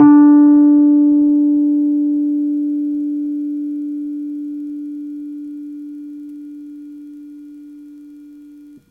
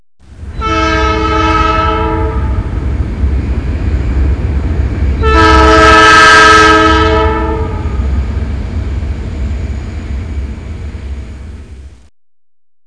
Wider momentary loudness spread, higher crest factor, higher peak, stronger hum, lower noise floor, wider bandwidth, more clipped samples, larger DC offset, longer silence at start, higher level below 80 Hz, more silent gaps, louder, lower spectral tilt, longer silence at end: first, 25 LU vs 20 LU; about the same, 14 dB vs 10 dB; about the same, 0 dBFS vs 0 dBFS; neither; first, -40 dBFS vs -30 dBFS; second, 1.9 kHz vs 10.5 kHz; neither; second, under 0.1% vs 0.9%; second, 0 s vs 0.3 s; second, -64 dBFS vs -16 dBFS; neither; second, -14 LUFS vs -9 LUFS; first, -10 dB/octave vs -5 dB/octave; second, 0.5 s vs 1 s